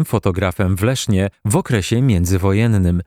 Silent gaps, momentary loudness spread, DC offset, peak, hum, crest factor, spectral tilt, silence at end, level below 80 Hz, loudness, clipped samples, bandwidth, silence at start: none; 3 LU; under 0.1%; -2 dBFS; none; 14 dB; -6 dB/octave; 0.05 s; -36 dBFS; -17 LUFS; under 0.1%; 16 kHz; 0 s